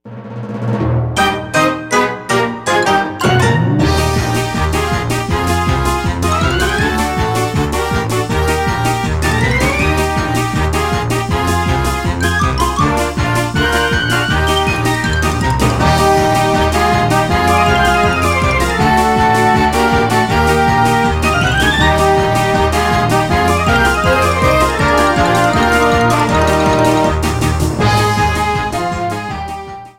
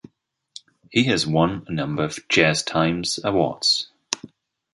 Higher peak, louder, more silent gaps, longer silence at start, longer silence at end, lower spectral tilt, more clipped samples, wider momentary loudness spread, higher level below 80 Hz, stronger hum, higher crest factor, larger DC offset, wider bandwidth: about the same, 0 dBFS vs 0 dBFS; first, -13 LUFS vs -21 LUFS; neither; second, 0.05 s vs 0.9 s; second, 0.1 s vs 0.45 s; about the same, -5 dB/octave vs -4 dB/octave; neither; second, 5 LU vs 10 LU; first, -24 dBFS vs -52 dBFS; neither; second, 12 dB vs 22 dB; neither; first, 17 kHz vs 11.5 kHz